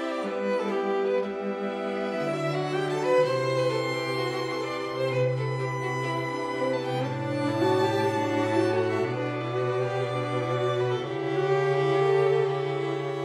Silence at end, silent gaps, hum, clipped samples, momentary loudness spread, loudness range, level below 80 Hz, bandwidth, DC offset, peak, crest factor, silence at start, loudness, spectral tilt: 0 s; none; none; under 0.1%; 6 LU; 3 LU; -68 dBFS; 13 kHz; under 0.1%; -12 dBFS; 16 dB; 0 s; -27 LUFS; -6.5 dB/octave